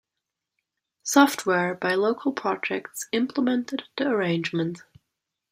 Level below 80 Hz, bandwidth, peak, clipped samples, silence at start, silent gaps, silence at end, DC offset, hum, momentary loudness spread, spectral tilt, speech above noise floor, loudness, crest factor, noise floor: -72 dBFS; 15.5 kHz; -2 dBFS; under 0.1%; 1.05 s; none; 0.7 s; under 0.1%; none; 12 LU; -4.5 dB/octave; 61 dB; -25 LUFS; 24 dB; -85 dBFS